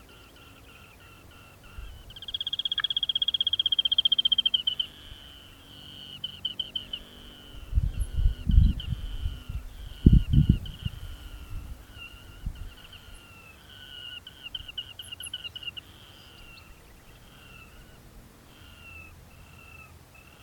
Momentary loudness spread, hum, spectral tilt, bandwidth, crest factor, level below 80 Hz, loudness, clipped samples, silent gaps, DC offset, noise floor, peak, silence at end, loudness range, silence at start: 27 LU; none; -5 dB/octave; 18.5 kHz; 28 dB; -34 dBFS; -27 LUFS; under 0.1%; none; under 0.1%; -52 dBFS; -2 dBFS; 0.6 s; 21 LU; 0.65 s